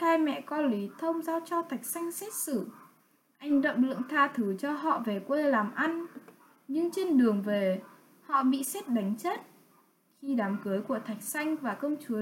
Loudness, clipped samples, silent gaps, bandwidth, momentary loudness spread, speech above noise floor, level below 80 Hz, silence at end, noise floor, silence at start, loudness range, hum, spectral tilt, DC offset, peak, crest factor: -30 LUFS; under 0.1%; none; 17 kHz; 8 LU; 37 dB; -84 dBFS; 0 s; -67 dBFS; 0 s; 4 LU; none; -5 dB/octave; under 0.1%; -12 dBFS; 18 dB